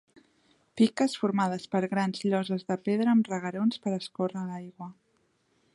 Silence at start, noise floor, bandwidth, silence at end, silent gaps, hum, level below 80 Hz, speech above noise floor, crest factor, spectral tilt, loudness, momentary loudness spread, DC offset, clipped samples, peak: 0.75 s; -71 dBFS; 11.5 kHz; 0.8 s; none; none; -76 dBFS; 43 dB; 18 dB; -6.5 dB/octave; -28 LUFS; 14 LU; under 0.1%; under 0.1%; -12 dBFS